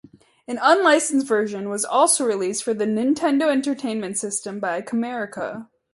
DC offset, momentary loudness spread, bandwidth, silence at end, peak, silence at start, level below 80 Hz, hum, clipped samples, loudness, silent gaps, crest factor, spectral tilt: under 0.1%; 11 LU; 12 kHz; 0.3 s; -2 dBFS; 0.5 s; -68 dBFS; none; under 0.1%; -21 LUFS; none; 18 dB; -3 dB/octave